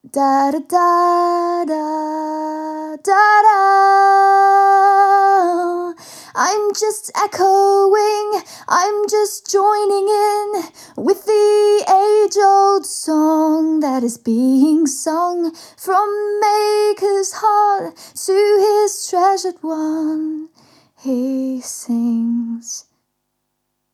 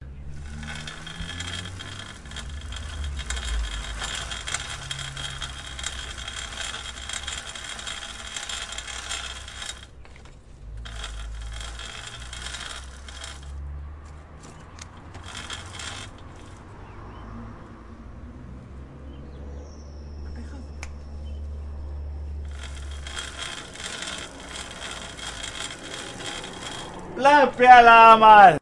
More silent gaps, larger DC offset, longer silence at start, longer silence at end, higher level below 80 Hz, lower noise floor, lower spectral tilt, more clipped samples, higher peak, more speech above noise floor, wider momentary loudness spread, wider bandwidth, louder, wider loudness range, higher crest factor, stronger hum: neither; neither; first, 0.15 s vs 0 s; first, 1.15 s vs 0.05 s; second, -76 dBFS vs -40 dBFS; first, -72 dBFS vs -45 dBFS; about the same, -2.5 dB/octave vs -3.5 dB/octave; neither; about the same, -2 dBFS vs 0 dBFS; first, 57 dB vs 33 dB; about the same, 13 LU vs 14 LU; first, 15 kHz vs 11.5 kHz; first, -15 LUFS vs -21 LUFS; second, 8 LU vs 12 LU; second, 14 dB vs 24 dB; neither